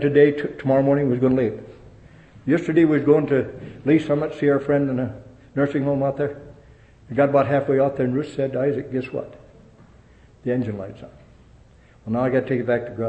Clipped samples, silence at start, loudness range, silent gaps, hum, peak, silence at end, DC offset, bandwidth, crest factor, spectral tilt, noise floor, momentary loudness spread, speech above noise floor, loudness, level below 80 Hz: under 0.1%; 0 s; 8 LU; none; none; -4 dBFS; 0 s; under 0.1%; 8.4 kHz; 18 dB; -9 dB/octave; -51 dBFS; 15 LU; 30 dB; -21 LUFS; -54 dBFS